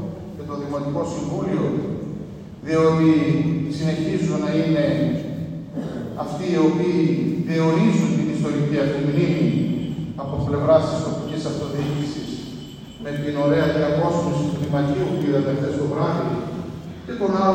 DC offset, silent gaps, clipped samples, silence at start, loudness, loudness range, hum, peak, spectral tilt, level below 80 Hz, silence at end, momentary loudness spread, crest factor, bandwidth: under 0.1%; none; under 0.1%; 0 s; -22 LUFS; 3 LU; none; -4 dBFS; -7.5 dB/octave; -50 dBFS; 0 s; 12 LU; 18 dB; 9.4 kHz